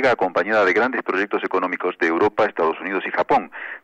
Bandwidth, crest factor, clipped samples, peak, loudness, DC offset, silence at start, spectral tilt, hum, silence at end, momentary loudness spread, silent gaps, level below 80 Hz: 8.2 kHz; 10 dB; under 0.1%; -10 dBFS; -20 LUFS; under 0.1%; 0 s; -5.5 dB/octave; none; 0.05 s; 5 LU; none; -62 dBFS